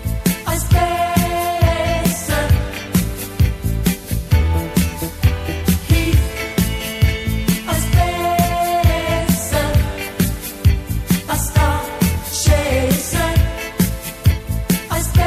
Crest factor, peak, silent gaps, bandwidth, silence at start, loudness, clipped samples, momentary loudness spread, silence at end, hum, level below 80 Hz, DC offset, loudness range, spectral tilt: 16 dB; 0 dBFS; none; 16 kHz; 0 s; -18 LUFS; under 0.1%; 4 LU; 0 s; none; -22 dBFS; under 0.1%; 1 LU; -5 dB/octave